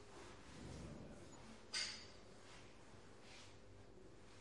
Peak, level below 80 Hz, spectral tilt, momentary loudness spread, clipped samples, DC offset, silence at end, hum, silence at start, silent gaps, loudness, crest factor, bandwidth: -32 dBFS; -70 dBFS; -2.5 dB/octave; 18 LU; under 0.1%; under 0.1%; 0 s; none; 0 s; none; -53 LUFS; 24 dB; 12 kHz